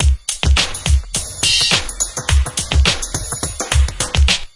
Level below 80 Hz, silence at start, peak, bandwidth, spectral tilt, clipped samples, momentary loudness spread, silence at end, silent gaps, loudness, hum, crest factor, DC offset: -20 dBFS; 0 s; 0 dBFS; 11.5 kHz; -2.5 dB/octave; under 0.1%; 8 LU; 0.1 s; none; -16 LUFS; none; 16 dB; under 0.1%